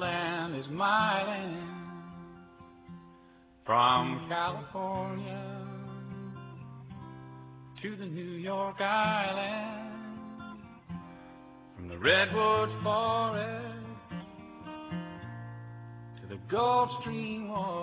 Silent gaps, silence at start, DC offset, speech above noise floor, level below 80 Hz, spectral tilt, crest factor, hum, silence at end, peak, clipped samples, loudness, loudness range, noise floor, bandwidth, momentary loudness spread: none; 0 s; under 0.1%; 28 dB; -62 dBFS; -3 dB/octave; 22 dB; none; 0 s; -10 dBFS; under 0.1%; -31 LUFS; 11 LU; -58 dBFS; 4 kHz; 22 LU